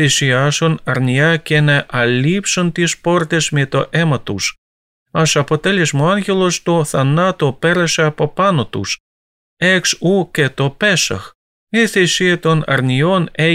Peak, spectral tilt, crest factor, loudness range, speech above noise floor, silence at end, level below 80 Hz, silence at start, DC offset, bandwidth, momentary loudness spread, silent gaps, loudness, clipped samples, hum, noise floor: -2 dBFS; -4.5 dB/octave; 12 dB; 2 LU; over 76 dB; 0 s; -48 dBFS; 0 s; under 0.1%; 15.5 kHz; 5 LU; 4.58-5.06 s, 9.00-9.57 s, 11.35-11.67 s; -15 LUFS; under 0.1%; none; under -90 dBFS